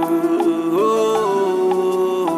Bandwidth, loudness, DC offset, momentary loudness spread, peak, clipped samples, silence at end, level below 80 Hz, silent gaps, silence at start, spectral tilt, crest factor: 15 kHz; -18 LUFS; under 0.1%; 2 LU; -6 dBFS; under 0.1%; 0 s; -66 dBFS; none; 0 s; -5.5 dB/octave; 12 dB